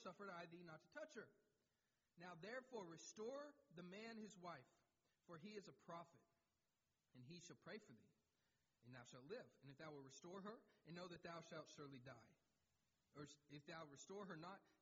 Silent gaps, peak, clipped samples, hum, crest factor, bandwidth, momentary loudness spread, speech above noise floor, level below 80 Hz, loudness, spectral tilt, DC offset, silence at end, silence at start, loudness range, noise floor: none; -42 dBFS; under 0.1%; none; 18 dB; 7.4 kHz; 8 LU; over 30 dB; under -90 dBFS; -60 LUFS; -4 dB/octave; under 0.1%; 0.05 s; 0 s; 6 LU; under -90 dBFS